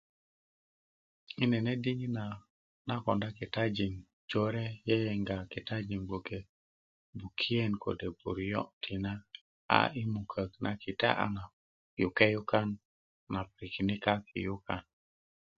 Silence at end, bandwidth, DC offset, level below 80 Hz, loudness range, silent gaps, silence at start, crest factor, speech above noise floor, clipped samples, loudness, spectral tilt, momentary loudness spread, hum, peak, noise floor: 0.75 s; 7.4 kHz; under 0.1%; -58 dBFS; 4 LU; 2.50-2.85 s, 4.13-4.28 s, 6.49-7.13 s, 8.73-8.81 s, 9.41-9.69 s, 11.53-11.97 s, 12.85-13.27 s; 1.4 s; 30 dB; over 56 dB; under 0.1%; -34 LUFS; -4.5 dB/octave; 14 LU; none; -4 dBFS; under -90 dBFS